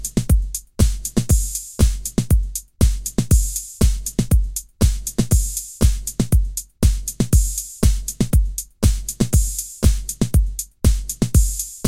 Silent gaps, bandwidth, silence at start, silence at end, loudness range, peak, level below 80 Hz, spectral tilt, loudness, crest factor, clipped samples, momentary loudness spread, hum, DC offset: none; 17 kHz; 0 s; 0 s; 0 LU; -2 dBFS; -20 dBFS; -5.5 dB/octave; -20 LUFS; 16 dB; under 0.1%; 5 LU; none; under 0.1%